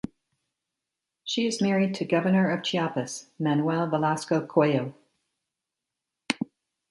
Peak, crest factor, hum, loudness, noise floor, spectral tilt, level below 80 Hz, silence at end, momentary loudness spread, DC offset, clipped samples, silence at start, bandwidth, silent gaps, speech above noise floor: -4 dBFS; 22 dB; none; -26 LUFS; -87 dBFS; -5.5 dB/octave; -68 dBFS; 0.45 s; 11 LU; under 0.1%; under 0.1%; 1.25 s; 11.5 kHz; none; 61 dB